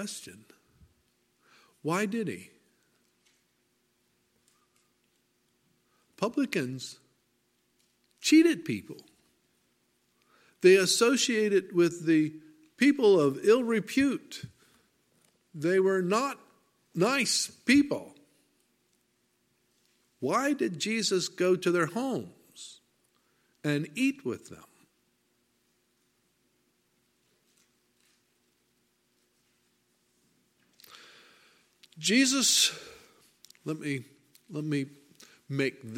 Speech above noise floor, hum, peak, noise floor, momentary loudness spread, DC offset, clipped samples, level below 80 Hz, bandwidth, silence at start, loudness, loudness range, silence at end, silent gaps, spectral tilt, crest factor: 46 dB; none; -8 dBFS; -73 dBFS; 21 LU; under 0.1%; under 0.1%; -76 dBFS; 16.5 kHz; 0 s; -27 LUFS; 12 LU; 0 s; none; -3.5 dB/octave; 22 dB